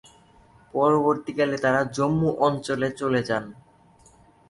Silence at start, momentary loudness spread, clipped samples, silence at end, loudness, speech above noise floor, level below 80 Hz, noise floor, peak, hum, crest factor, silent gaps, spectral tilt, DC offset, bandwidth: 0.75 s; 8 LU; under 0.1%; 1 s; -24 LUFS; 32 dB; -58 dBFS; -55 dBFS; -6 dBFS; none; 18 dB; none; -6.5 dB/octave; under 0.1%; 11.5 kHz